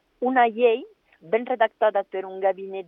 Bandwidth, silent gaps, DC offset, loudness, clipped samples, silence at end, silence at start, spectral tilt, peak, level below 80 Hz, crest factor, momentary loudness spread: 3.9 kHz; none; under 0.1%; -23 LUFS; under 0.1%; 0.05 s; 0.2 s; -7.5 dB/octave; -6 dBFS; -78 dBFS; 18 dB; 8 LU